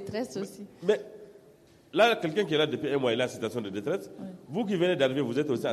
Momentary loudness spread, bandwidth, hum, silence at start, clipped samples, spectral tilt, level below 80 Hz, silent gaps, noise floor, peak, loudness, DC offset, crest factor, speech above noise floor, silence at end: 12 LU; 13.5 kHz; none; 0 s; under 0.1%; -5.5 dB/octave; -70 dBFS; none; -57 dBFS; -12 dBFS; -29 LUFS; under 0.1%; 18 dB; 29 dB; 0 s